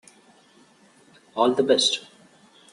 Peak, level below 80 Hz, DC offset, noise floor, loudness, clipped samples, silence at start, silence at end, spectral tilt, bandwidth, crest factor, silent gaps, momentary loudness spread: -6 dBFS; -72 dBFS; under 0.1%; -56 dBFS; -21 LUFS; under 0.1%; 1.35 s; 0.7 s; -2.5 dB/octave; 11.5 kHz; 20 dB; none; 11 LU